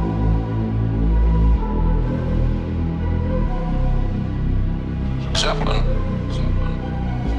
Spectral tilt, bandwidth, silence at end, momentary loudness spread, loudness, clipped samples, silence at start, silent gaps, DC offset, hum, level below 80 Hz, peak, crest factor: -6.5 dB/octave; 9.6 kHz; 0 s; 5 LU; -22 LUFS; under 0.1%; 0 s; none; under 0.1%; none; -22 dBFS; -6 dBFS; 12 dB